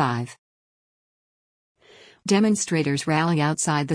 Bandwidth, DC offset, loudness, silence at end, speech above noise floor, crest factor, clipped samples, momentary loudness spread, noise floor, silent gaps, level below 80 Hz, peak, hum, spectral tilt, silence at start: 10.5 kHz; under 0.1%; -22 LUFS; 0 s; 30 dB; 16 dB; under 0.1%; 11 LU; -52 dBFS; 0.38-1.75 s; -66 dBFS; -8 dBFS; none; -5 dB/octave; 0 s